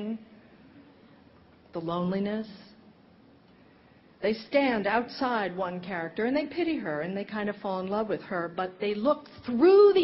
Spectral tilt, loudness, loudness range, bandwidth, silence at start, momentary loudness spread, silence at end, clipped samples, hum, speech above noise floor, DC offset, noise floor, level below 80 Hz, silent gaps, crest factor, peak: -4.5 dB/octave; -28 LUFS; 8 LU; 5.8 kHz; 0 s; 10 LU; 0 s; under 0.1%; none; 31 dB; under 0.1%; -57 dBFS; -66 dBFS; none; 18 dB; -10 dBFS